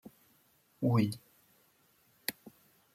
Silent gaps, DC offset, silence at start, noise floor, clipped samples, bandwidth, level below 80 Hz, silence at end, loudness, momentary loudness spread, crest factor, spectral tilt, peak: none; under 0.1%; 0.05 s; -69 dBFS; under 0.1%; 16 kHz; -76 dBFS; 0.45 s; -34 LUFS; 25 LU; 22 dB; -6.5 dB/octave; -16 dBFS